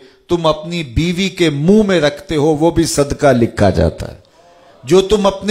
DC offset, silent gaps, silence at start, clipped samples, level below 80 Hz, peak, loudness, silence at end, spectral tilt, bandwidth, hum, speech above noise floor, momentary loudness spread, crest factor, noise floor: under 0.1%; none; 0.3 s; under 0.1%; -32 dBFS; 0 dBFS; -14 LUFS; 0 s; -5.5 dB/octave; 16 kHz; none; 32 dB; 9 LU; 14 dB; -45 dBFS